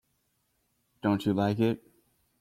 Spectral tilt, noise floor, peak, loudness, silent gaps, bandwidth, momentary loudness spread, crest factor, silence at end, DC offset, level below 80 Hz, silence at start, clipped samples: -8 dB/octave; -75 dBFS; -14 dBFS; -29 LUFS; none; 15.5 kHz; 6 LU; 18 dB; 0.65 s; under 0.1%; -66 dBFS; 1.05 s; under 0.1%